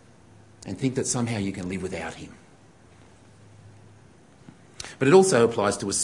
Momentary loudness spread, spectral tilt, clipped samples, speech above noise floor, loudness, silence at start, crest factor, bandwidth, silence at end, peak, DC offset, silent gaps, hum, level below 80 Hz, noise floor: 23 LU; -4.5 dB/octave; under 0.1%; 31 dB; -23 LUFS; 0.65 s; 22 dB; 11.5 kHz; 0 s; -4 dBFS; under 0.1%; none; none; -60 dBFS; -53 dBFS